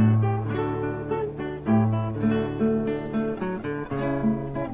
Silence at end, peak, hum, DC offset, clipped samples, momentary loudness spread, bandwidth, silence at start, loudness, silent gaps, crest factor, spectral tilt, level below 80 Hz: 0 s; -10 dBFS; none; under 0.1%; under 0.1%; 7 LU; 3.9 kHz; 0 s; -26 LUFS; none; 14 dB; -12.5 dB/octave; -48 dBFS